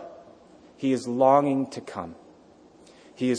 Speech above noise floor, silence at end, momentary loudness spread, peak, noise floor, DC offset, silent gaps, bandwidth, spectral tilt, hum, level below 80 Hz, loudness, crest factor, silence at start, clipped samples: 30 dB; 0 s; 19 LU; -6 dBFS; -53 dBFS; under 0.1%; none; 10 kHz; -6.5 dB/octave; none; -70 dBFS; -24 LUFS; 20 dB; 0 s; under 0.1%